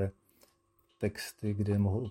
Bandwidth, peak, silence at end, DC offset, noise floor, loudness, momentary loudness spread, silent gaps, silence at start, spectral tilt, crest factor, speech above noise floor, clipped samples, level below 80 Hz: 16 kHz; -16 dBFS; 0 s; under 0.1%; -72 dBFS; -34 LUFS; 8 LU; none; 0 s; -7 dB/octave; 18 dB; 40 dB; under 0.1%; -64 dBFS